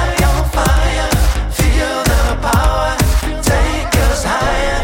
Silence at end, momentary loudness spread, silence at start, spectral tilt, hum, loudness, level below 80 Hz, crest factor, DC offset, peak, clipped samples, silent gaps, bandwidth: 0 s; 2 LU; 0 s; -4.5 dB/octave; none; -15 LUFS; -16 dBFS; 12 dB; under 0.1%; -2 dBFS; under 0.1%; none; 17 kHz